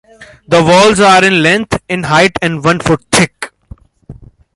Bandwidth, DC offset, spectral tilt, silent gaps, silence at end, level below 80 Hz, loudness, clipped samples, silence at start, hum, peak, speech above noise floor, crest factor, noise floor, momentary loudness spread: 16 kHz; under 0.1%; -4 dB/octave; none; 0.45 s; -40 dBFS; -9 LUFS; under 0.1%; 0.2 s; none; 0 dBFS; 27 dB; 12 dB; -37 dBFS; 10 LU